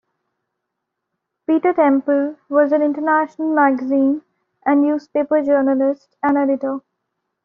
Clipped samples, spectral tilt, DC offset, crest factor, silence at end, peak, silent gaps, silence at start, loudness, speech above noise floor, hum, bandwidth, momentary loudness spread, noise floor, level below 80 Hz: under 0.1%; -4.5 dB/octave; under 0.1%; 16 dB; 0.65 s; -2 dBFS; none; 1.5 s; -18 LUFS; 62 dB; none; 5.4 kHz; 7 LU; -78 dBFS; -66 dBFS